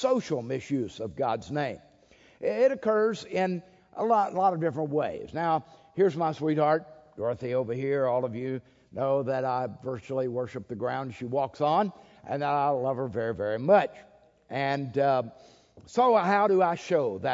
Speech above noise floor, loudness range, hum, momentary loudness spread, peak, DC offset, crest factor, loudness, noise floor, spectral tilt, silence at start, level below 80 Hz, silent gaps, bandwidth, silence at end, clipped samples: 31 dB; 4 LU; none; 11 LU; -8 dBFS; under 0.1%; 20 dB; -28 LUFS; -59 dBFS; -7 dB/octave; 0 s; -66 dBFS; none; 7.8 kHz; 0 s; under 0.1%